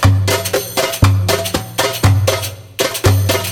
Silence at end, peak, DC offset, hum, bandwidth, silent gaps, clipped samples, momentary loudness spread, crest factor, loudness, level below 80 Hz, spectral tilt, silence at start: 0 s; 0 dBFS; under 0.1%; none; 17 kHz; none; under 0.1%; 6 LU; 14 dB; -15 LUFS; -30 dBFS; -4.5 dB/octave; 0 s